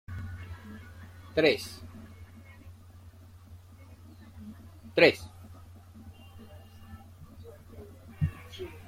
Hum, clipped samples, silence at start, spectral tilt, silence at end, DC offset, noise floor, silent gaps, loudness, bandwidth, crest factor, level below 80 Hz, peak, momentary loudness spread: none; under 0.1%; 0.1 s; -5.5 dB/octave; 0 s; under 0.1%; -51 dBFS; none; -28 LUFS; 16 kHz; 28 dB; -56 dBFS; -6 dBFS; 26 LU